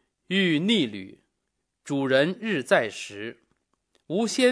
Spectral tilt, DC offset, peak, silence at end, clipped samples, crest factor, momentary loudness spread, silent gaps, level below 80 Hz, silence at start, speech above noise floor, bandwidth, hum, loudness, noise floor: -4.5 dB/octave; under 0.1%; -6 dBFS; 0 s; under 0.1%; 20 dB; 15 LU; none; -76 dBFS; 0.3 s; 55 dB; 11 kHz; none; -25 LUFS; -80 dBFS